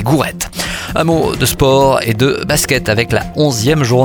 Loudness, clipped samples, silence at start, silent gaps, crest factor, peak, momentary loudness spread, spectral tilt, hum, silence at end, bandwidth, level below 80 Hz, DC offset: -13 LUFS; under 0.1%; 0 s; none; 12 dB; 0 dBFS; 7 LU; -4.5 dB/octave; none; 0 s; 19 kHz; -32 dBFS; under 0.1%